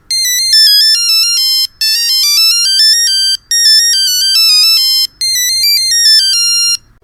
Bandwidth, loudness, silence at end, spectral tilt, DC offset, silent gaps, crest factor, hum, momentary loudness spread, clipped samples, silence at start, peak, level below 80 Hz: 17.5 kHz; -6 LUFS; 0.25 s; 5.5 dB/octave; under 0.1%; none; 10 dB; none; 5 LU; under 0.1%; 0.1 s; 0 dBFS; -50 dBFS